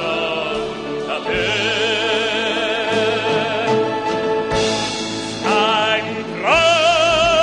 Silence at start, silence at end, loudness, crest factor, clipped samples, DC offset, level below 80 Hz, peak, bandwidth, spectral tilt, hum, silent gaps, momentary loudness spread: 0 s; 0 s; -17 LUFS; 16 dB; under 0.1%; 0.2%; -44 dBFS; -2 dBFS; 11 kHz; -3 dB/octave; none; none; 9 LU